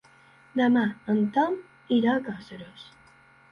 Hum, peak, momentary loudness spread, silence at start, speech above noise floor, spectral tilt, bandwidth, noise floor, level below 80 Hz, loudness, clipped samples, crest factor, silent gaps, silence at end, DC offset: none; -12 dBFS; 19 LU; 0.55 s; 31 dB; -7.5 dB/octave; 6.6 kHz; -56 dBFS; -68 dBFS; -25 LUFS; under 0.1%; 16 dB; none; 0.7 s; under 0.1%